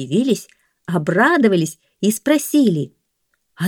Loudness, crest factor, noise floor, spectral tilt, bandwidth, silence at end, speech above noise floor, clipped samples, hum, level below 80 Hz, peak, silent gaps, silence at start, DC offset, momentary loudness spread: -17 LUFS; 16 dB; -70 dBFS; -5.5 dB/octave; 19 kHz; 0 s; 53 dB; under 0.1%; none; -66 dBFS; -2 dBFS; none; 0 s; under 0.1%; 11 LU